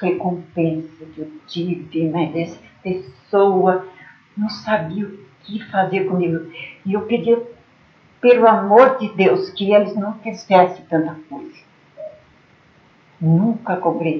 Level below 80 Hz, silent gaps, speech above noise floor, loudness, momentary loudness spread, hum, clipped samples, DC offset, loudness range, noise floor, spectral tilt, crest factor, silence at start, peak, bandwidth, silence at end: -64 dBFS; none; 34 dB; -18 LUFS; 21 LU; none; under 0.1%; under 0.1%; 8 LU; -52 dBFS; -8 dB/octave; 18 dB; 0 s; 0 dBFS; 6.6 kHz; 0 s